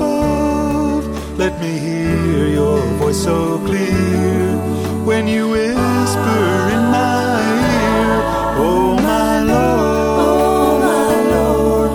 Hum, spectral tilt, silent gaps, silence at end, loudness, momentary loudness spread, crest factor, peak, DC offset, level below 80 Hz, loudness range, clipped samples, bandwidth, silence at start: none; -6 dB/octave; none; 0 s; -15 LUFS; 5 LU; 14 dB; 0 dBFS; under 0.1%; -30 dBFS; 3 LU; under 0.1%; 19 kHz; 0 s